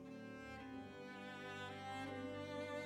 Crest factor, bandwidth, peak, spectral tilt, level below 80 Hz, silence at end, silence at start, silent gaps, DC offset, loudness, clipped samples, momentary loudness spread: 14 dB; 16.5 kHz; -36 dBFS; -5.5 dB/octave; -74 dBFS; 0 s; 0 s; none; under 0.1%; -50 LUFS; under 0.1%; 5 LU